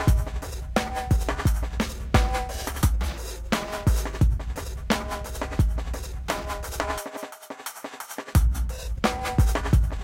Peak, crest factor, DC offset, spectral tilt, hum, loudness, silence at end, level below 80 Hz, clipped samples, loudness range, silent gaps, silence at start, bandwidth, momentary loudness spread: -6 dBFS; 20 dB; under 0.1%; -5.5 dB/octave; none; -27 LUFS; 0 s; -28 dBFS; under 0.1%; 4 LU; none; 0 s; 16.5 kHz; 12 LU